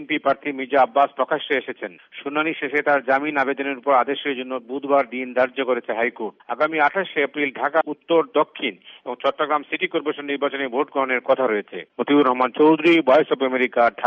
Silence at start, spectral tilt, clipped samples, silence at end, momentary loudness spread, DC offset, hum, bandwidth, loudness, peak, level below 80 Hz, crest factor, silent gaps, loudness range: 0 s; -2 dB/octave; under 0.1%; 0 s; 11 LU; under 0.1%; none; 6.6 kHz; -21 LUFS; -6 dBFS; -72 dBFS; 16 dB; none; 4 LU